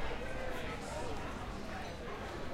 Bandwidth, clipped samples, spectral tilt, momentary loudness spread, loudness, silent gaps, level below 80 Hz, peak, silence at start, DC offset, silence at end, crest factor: 15 kHz; under 0.1%; -5 dB/octave; 3 LU; -42 LUFS; none; -48 dBFS; -26 dBFS; 0 s; under 0.1%; 0 s; 14 dB